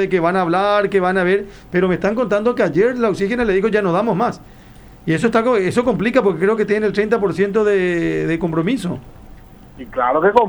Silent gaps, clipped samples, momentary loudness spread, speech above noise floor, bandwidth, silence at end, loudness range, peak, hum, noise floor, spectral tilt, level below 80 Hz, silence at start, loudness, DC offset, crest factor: none; under 0.1%; 6 LU; 23 dB; over 20 kHz; 0 s; 2 LU; 0 dBFS; none; -40 dBFS; -7 dB/octave; -44 dBFS; 0 s; -17 LUFS; under 0.1%; 16 dB